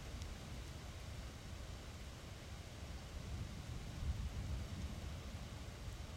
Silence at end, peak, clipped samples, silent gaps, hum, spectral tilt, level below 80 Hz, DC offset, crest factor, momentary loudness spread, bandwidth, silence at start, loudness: 0 s; -30 dBFS; under 0.1%; none; none; -5 dB/octave; -50 dBFS; under 0.1%; 18 dB; 6 LU; 16 kHz; 0 s; -49 LUFS